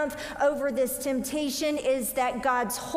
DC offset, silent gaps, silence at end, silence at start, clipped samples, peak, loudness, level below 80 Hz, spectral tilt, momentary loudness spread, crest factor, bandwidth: under 0.1%; none; 0 s; 0 s; under 0.1%; -14 dBFS; -27 LUFS; -56 dBFS; -3 dB/octave; 3 LU; 14 dB; 16 kHz